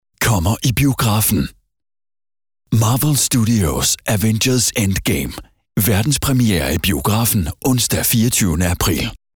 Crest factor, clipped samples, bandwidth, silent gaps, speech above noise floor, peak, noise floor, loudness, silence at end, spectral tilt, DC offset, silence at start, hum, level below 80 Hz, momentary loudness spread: 10 dB; under 0.1%; over 20 kHz; none; over 74 dB; -6 dBFS; under -90 dBFS; -16 LUFS; 0.2 s; -4 dB/octave; under 0.1%; 0.2 s; none; -32 dBFS; 5 LU